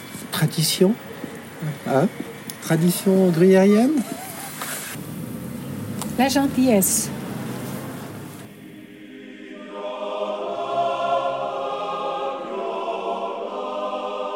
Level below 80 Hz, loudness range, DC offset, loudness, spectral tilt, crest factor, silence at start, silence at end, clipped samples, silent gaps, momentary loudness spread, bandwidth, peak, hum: -60 dBFS; 10 LU; under 0.1%; -22 LUFS; -5 dB/octave; 18 dB; 0 s; 0 s; under 0.1%; none; 18 LU; 16.5 kHz; -4 dBFS; none